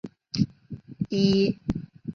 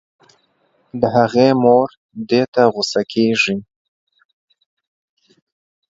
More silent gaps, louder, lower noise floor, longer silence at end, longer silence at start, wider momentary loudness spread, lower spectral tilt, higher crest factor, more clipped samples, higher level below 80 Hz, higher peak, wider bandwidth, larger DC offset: second, none vs 1.97-2.09 s, 2.48-2.53 s; second, -26 LUFS vs -16 LUFS; second, -43 dBFS vs -61 dBFS; second, 0 s vs 2.3 s; second, 0.05 s vs 0.95 s; first, 15 LU vs 12 LU; first, -7 dB/octave vs -5.5 dB/octave; about the same, 18 dB vs 18 dB; neither; first, -50 dBFS vs -58 dBFS; second, -8 dBFS vs 0 dBFS; second, 7 kHz vs 7.8 kHz; neither